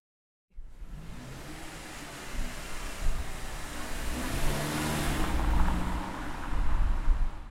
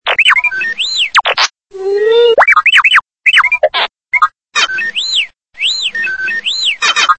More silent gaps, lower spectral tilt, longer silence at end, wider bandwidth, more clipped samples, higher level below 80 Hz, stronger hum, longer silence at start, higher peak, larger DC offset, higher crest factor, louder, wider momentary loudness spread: neither; first, -4.5 dB/octave vs 1 dB/octave; about the same, 0 s vs 0.05 s; first, 16 kHz vs 11 kHz; second, under 0.1% vs 0.2%; first, -32 dBFS vs -56 dBFS; neither; first, 0.55 s vs 0.05 s; second, -12 dBFS vs 0 dBFS; second, under 0.1% vs 0.3%; first, 18 dB vs 12 dB; second, -35 LUFS vs -10 LUFS; first, 14 LU vs 8 LU